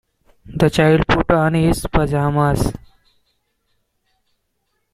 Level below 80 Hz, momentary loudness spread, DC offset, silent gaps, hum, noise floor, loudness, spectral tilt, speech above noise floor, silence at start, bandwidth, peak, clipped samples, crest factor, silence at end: -32 dBFS; 9 LU; under 0.1%; none; none; -70 dBFS; -16 LUFS; -6.5 dB/octave; 55 dB; 0.45 s; 15 kHz; -2 dBFS; under 0.1%; 18 dB; 2.15 s